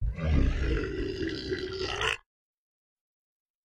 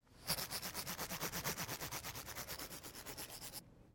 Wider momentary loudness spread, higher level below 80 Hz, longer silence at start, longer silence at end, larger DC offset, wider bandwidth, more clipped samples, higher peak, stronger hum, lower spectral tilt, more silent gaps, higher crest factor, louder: about the same, 6 LU vs 8 LU; first, -34 dBFS vs -64 dBFS; about the same, 0 s vs 0.05 s; first, 1.55 s vs 0.05 s; neither; second, 9.8 kHz vs 17 kHz; neither; first, -12 dBFS vs -22 dBFS; neither; first, -5.5 dB/octave vs -2 dB/octave; neither; about the same, 20 dB vs 24 dB; first, -31 LUFS vs -44 LUFS